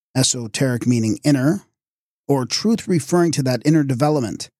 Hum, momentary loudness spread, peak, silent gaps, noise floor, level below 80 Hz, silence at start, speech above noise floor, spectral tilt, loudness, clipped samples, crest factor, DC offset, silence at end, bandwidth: none; 4 LU; -4 dBFS; 1.88-2.24 s; under -90 dBFS; -58 dBFS; 0.15 s; over 72 dB; -5 dB/octave; -19 LUFS; under 0.1%; 14 dB; under 0.1%; 0.15 s; 15 kHz